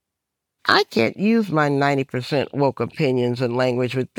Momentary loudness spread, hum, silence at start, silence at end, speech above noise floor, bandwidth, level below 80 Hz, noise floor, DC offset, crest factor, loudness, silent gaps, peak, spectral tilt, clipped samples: 6 LU; none; 0.65 s; 0.15 s; 62 dB; 17 kHz; -66 dBFS; -82 dBFS; under 0.1%; 18 dB; -20 LUFS; none; -2 dBFS; -6.5 dB/octave; under 0.1%